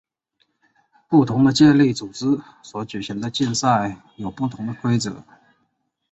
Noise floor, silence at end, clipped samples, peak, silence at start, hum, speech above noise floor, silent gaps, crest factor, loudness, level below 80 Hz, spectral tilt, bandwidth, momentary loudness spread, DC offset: -71 dBFS; 0.9 s; under 0.1%; -4 dBFS; 1.1 s; none; 52 dB; none; 18 dB; -20 LUFS; -56 dBFS; -5.5 dB/octave; 8.2 kHz; 18 LU; under 0.1%